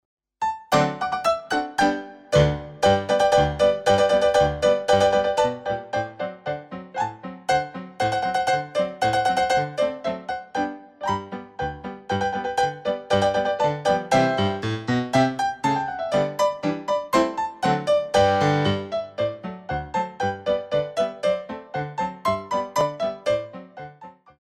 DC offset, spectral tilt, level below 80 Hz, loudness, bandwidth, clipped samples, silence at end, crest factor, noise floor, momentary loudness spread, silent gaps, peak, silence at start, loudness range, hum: under 0.1%; -5 dB/octave; -48 dBFS; -23 LUFS; 14.5 kHz; under 0.1%; 0.3 s; 18 dB; -46 dBFS; 12 LU; none; -4 dBFS; 0.4 s; 6 LU; none